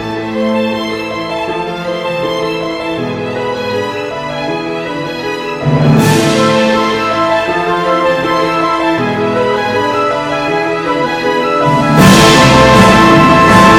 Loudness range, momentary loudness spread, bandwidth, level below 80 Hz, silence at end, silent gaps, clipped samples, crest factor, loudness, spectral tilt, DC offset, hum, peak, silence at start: 9 LU; 13 LU; 18.5 kHz; -32 dBFS; 0 s; none; 2%; 10 dB; -11 LUFS; -5 dB/octave; under 0.1%; none; 0 dBFS; 0 s